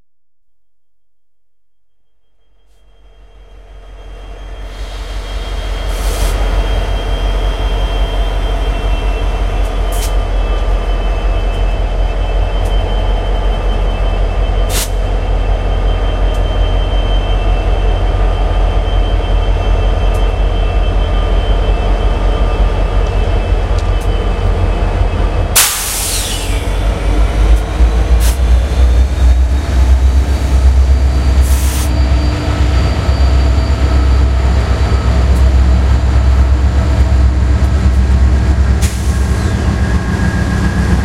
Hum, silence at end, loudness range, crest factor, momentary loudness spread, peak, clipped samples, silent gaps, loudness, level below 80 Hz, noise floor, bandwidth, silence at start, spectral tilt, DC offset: none; 0 s; 5 LU; 12 dB; 6 LU; 0 dBFS; under 0.1%; none; -14 LUFS; -12 dBFS; -75 dBFS; 16 kHz; 3.4 s; -5 dB/octave; 0.7%